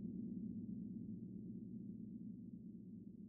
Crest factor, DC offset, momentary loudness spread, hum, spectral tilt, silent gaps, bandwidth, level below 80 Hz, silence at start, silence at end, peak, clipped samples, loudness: 12 dB; under 0.1%; 7 LU; none; -17 dB/octave; none; 0.9 kHz; -74 dBFS; 0 s; 0 s; -38 dBFS; under 0.1%; -51 LUFS